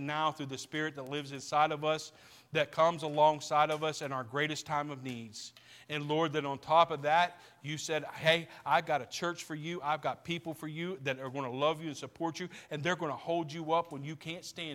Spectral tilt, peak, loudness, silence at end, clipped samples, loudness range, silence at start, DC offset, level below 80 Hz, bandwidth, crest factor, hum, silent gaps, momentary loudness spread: -4.5 dB/octave; -10 dBFS; -33 LUFS; 0 s; under 0.1%; 5 LU; 0 s; under 0.1%; -76 dBFS; 16.5 kHz; 22 dB; none; none; 13 LU